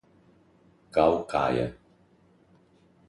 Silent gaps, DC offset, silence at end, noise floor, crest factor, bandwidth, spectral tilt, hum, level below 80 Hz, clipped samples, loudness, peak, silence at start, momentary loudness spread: none; under 0.1%; 1.35 s; -61 dBFS; 22 dB; 11.5 kHz; -7 dB/octave; none; -54 dBFS; under 0.1%; -26 LUFS; -8 dBFS; 0.95 s; 7 LU